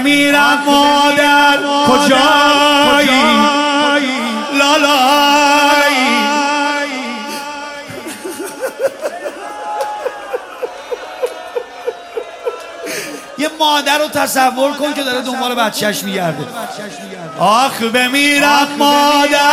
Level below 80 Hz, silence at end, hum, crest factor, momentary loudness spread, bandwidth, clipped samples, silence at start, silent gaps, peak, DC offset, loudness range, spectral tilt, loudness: -52 dBFS; 0 s; none; 14 dB; 16 LU; 16 kHz; under 0.1%; 0 s; none; 0 dBFS; under 0.1%; 13 LU; -2.5 dB/octave; -12 LUFS